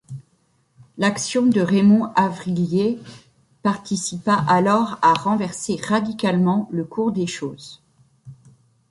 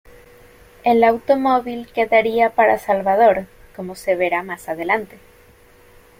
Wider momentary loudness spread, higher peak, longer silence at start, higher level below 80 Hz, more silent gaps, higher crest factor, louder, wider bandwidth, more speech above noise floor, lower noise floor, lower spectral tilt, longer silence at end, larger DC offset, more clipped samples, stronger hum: about the same, 11 LU vs 13 LU; about the same, -4 dBFS vs -2 dBFS; second, 0.1 s vs 0.85 s; second, -60 dBFS vs -52 dBFS; neither; about the same, 18 dB vs 18 dB; about the same, -20 LUFS vs -18 LUFS; second, 11.5 kHz vs 16.5 kHz; first, 44 dB vs 32 dB; first, -63 dBFS vs -49 dBFS; about the same, -5.5 dB/octave vs -5.5 dB/octave; second, 0.55 s vs 1.15 s; neither; neither; neither